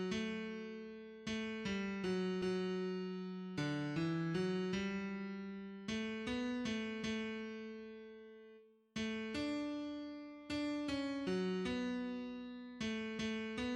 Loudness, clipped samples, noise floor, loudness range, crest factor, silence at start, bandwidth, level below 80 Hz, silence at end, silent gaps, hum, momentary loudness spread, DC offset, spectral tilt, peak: -42 LUFS; under 0.1%; -63 dBFS; 4 LU; 14 dB; 0 s; 10.5 kHz; -68 dBFS; 0 s; none; none; 11 LU; under 0.1%; -6 dB/octave; -26 dBFS